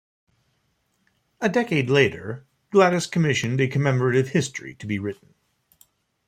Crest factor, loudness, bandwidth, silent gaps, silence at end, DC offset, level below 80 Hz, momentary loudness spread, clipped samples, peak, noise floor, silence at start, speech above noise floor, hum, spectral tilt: 20 dB; -22 LUFS; 15 kHz; none; 1.15 s; under 0.1%; -62 dBFS; 16 LU; under 0.1%; -4 dBFS; -70 dBFS; 1.4 s; 48 dB; none; -5.5 dB/octave